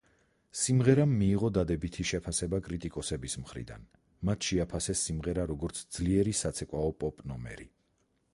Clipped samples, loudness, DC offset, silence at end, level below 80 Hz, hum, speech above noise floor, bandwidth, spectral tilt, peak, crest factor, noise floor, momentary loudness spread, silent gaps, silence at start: under 0.1%; -31 LUFS; under 0.1%; 0.65 s; -46 dBFS; none; 43 dB; 11.5 kHz; -5 dB/octave; -12 dBFS; 20 dB; -74 dBFS; 16 LU; none; 0.55 s